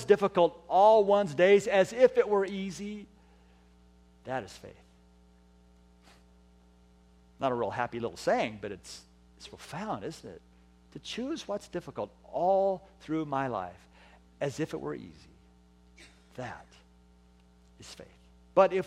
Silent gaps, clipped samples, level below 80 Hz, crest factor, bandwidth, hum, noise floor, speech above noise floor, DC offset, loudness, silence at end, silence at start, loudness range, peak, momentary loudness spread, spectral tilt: none; under 0.1%; -62 dBFS; 22 dB; 13 kHz; 60 Hz at -60 dBFS; -60 dBFS; 31 dB; under 0.1%; -29 LUFS; 0 s; 0 s; 20 LU; -10 dBFS; 25 LU; -5.5 dB/octave